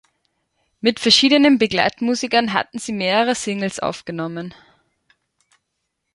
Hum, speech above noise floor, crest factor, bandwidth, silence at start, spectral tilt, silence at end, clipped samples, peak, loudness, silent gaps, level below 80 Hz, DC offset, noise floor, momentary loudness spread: none; 57 dB; 20 dB; 11.5 kHz; 0.85 s; -3.5 dB/octave; 1.65 s; under 0.1%; 0 dBFS; -18 LUFS; none; -58 dBFS; under 0.1%; -76 dBFS; 14 LU